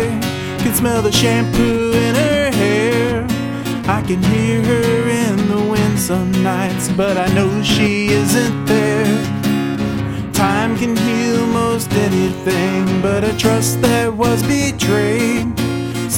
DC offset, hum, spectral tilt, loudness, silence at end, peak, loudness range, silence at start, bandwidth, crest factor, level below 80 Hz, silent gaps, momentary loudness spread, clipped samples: under 0.1%; none; -5 dB/octave; -16 LUFS; 0 s; -2 dBFS; 1 LU; 0 s; 17.5 kHz; 14 dB; -36 dBFS; none; 5 LU; under 0.1%